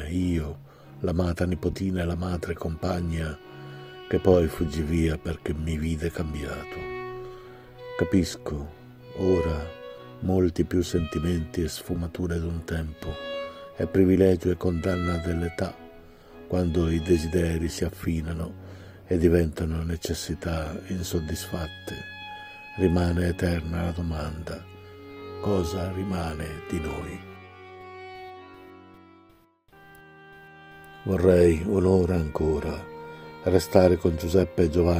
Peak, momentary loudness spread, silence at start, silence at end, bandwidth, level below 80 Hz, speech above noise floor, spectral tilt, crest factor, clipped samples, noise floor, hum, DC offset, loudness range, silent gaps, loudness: -2 dBFS; 20 LU; 0 s; 0 s; 16 kHz; -42 dBFS; 34 dB; -7 dB/octave; 24 dB; under 0.1%; -59 dBFS; none; under 0.1%; 7 LU; none; -26 LUFS